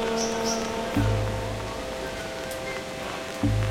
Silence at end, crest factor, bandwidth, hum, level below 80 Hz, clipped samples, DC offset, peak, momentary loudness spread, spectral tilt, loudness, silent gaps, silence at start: 0 s; 16 dB; 16.5 kHz; none; -38 dBFS; under 0.1%; under 0.1%; -12 dBFS; 7 LU; -5 dB/octave; -29 LUFS; none; 0 s